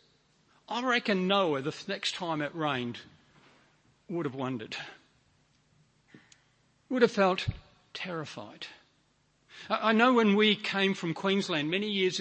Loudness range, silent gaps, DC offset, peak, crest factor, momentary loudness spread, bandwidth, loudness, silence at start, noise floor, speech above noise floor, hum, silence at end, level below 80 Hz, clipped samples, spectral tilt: 13 LU; none; under 0.1%; -10 dBFS; 22 dB; 19 LU; 8.8 kHz; -29 LUFS; 0.7 s; -70 dBFS; 41 dB; none; 0 s; -62 dBFS; under 0.1%; -5 dB/octave